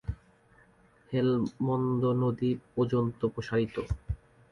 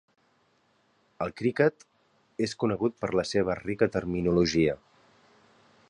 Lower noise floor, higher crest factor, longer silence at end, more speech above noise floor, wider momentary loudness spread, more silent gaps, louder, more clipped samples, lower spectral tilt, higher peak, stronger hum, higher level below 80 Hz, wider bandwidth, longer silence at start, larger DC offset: second, -61 dBFS vs -68 dBFS; second, 14 dB vs 20 dB; second, 0.35 s vs 1.15 s; second, 33 dB vs 41 dB; about the same, 11 LU vs 10 LU; neither; about the same, -30 LUFS vs -28 LUFS; neither; first, -9 dB/octave vs -6 dB/octave; second, -16 dBFS vs -8 dBFS; neither; first, -48 dBFS vs -54 dBFS; second, 7 kHz vs 10.5 kHz; second, 0.05 s vs 1.2 s; neither